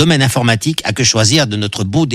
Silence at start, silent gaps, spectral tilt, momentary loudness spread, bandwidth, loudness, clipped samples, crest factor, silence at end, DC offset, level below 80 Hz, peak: 0 s; none; -4 dB/octave; 6 LU; 15.5 kHz; -13 LUFS; under 0.1%; 12 dB; 0 s; under 0.1%; -42 dBFS; 0 dBFS